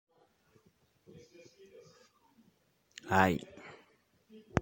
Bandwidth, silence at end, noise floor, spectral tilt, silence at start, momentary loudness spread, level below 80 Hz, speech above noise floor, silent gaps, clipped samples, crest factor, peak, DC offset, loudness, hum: 16.5 kHz; 0 s; -71 dBFS; -6 dB/octave; 3.05 s; 29 LU; -64 dBFS; 37 dB; none; under 0.1%; 32 dB; -8 dBFS; under 0.1%; -31 LUFS; none